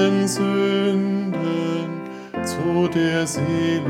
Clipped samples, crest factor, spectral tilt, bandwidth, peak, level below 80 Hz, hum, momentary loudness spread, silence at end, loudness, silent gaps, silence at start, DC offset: under 0.1%; 16 dB; -5.5 dB/octave; 16 kHz; -4 dBFS; -60 dBFS; none; 8 LU; 0 s; -21 LUFS; none; 0 s; under 0.1%